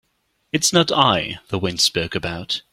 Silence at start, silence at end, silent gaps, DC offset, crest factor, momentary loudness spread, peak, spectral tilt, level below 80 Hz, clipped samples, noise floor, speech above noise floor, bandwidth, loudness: 0.55 s; 0.1 s; none; under 0.1%; 20 dB; 10 LU; 0 dBFS; -3 dB/octave; -50 dBFS; under 0.1%; -68 dBFS; 48 dB; 16.5 kHz; -19 LUFS